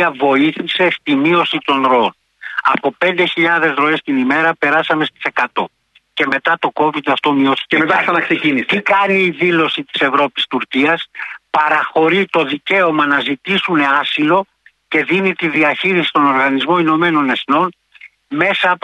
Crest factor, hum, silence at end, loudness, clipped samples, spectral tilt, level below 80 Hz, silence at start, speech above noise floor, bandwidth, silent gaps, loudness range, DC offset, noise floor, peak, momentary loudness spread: 14 dB; none; 0.05 s; -14 LUFS; under 0.1%; -6 dB/octave; -64 dBFS; 0 s; 29 dB; 10 kHz; none; 2 LU; under 0.1%; -43 dBFS; 0 dBFS; 5 LU